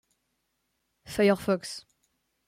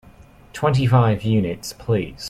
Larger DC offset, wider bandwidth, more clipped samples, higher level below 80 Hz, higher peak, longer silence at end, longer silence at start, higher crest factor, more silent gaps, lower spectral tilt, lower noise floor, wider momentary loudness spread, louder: neither; first, 16 kHz vs 14.5 kHz; neither; second, -64 dBFS vs -44 dBFS; second, -10 dBFS vs -4 dBFS; first, 0.7 s vs 0 s; first, 1.1 s vs 0.55 s; about the same, 20 dB vs 16 dB; neither; second, -5.5 dB/octave vs -7 dB/octave; first, -78 dBFS vs -47 dBFS; first, 16 LU vs 11 LU; second, -27 LUFS vs -20 LUFS